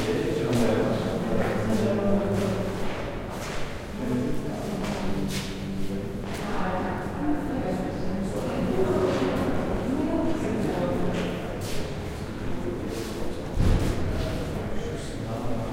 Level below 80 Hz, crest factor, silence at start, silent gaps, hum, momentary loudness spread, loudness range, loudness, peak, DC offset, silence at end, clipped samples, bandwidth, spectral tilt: -36 dBFS; 16 dB; 0 s; none; none; 8 LU; 4 LU; -28 LUFS; -10 dBFS; under 0.1%; 0 s; under 0.1%; 16 kHz; -6.5 dB/octave